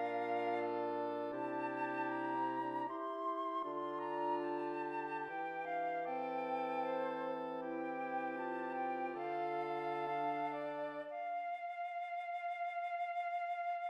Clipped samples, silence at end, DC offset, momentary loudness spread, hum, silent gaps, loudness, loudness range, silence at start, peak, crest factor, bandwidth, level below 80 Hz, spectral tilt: under 0.1%; 0 s; under 0.1%; 4 LU; none; none; -41 LUFS; 2 LU; 0 s; -28 dBFS; 12 dB; 8.8 kHz; under -90 dBFS; -6.5 dB/octave